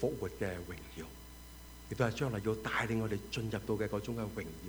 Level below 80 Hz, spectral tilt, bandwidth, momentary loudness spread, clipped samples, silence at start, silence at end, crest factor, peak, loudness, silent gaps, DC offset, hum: -54 dBFS; -6 dB/octave; over 20 kHz; 17 LU; under 0.1%; 0 s; 0 s; 20 dB; -18 dBFS; -37 LUFS; none; under 0.1%; none